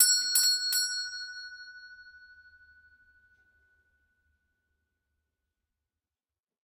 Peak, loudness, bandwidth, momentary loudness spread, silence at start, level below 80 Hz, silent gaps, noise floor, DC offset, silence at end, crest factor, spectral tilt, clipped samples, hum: -6 dBFS; -25 LUFS; 15 kHz; 25 LU; 0 s; -78 dBFS; none; under -90 dBFS; under 0.1%; 4.5 s; 28 dB; 5.5 dB/octave; under 0.1%; none